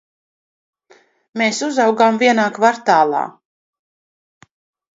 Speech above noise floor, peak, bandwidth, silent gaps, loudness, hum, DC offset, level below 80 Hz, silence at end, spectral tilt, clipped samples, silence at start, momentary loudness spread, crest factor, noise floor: 38 dB; 0 dBFS; 8 kHz; none; -15 LUFS; none; under 0.1%; -72 dBFS; 1.65 s; -3.5 dB/octave; under 0.1%; 1.35 s; 9 LU; 18 dB; -53 dBFS